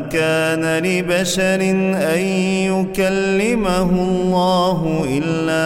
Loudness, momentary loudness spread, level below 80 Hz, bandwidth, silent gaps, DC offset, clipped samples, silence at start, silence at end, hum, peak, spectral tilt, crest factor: -17 LUFS; 3 LU; -40 dBFS; 16.5 kHz; none; under 0.1%; under 0.1%; 0 s; 0 s; none; -4 dBFS; -5.5 dB/octave; 14 dB